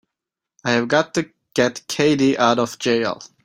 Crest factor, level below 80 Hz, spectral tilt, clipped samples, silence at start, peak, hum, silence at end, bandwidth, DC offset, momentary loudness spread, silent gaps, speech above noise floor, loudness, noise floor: 18 dB; -60 dBFS; -4.5 dB/octave; under 0.1%; 0.65 s; -2 dBFS; none; 0.2 s; 16 kHz; under 0.1%; 9 LU; none; 66 dB; -20 LUFS; -85 dBFS